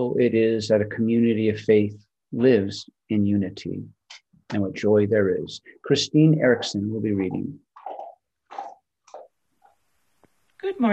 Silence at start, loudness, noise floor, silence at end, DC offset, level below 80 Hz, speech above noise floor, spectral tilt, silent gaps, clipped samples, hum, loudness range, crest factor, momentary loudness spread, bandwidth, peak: 0 s; -22 LUFS; -71 dBFS; 0 s; under 0.1%; -66 dBFS; 50 dB; -6.5 dB/octave; none; under 0.1%; none; 11 LU; 16 dB; 19 LU; 8.4 kHz; -6 dBFS